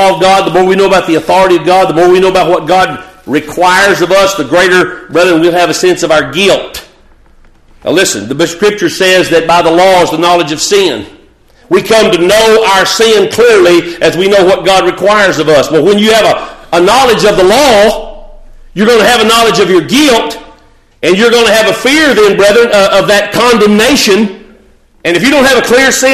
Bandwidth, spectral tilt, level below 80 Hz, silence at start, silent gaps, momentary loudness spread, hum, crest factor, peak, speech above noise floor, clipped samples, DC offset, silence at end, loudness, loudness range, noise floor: 14.5 kHz; -3.5 dB/octave; -36 dBFS; 0 s; none; 7 LU; none; 8 dB; 0 dBFS; 36 dB; 0.2%; 0.2%; 0 s; -6 LUFS; 3 LU; -42 dBFS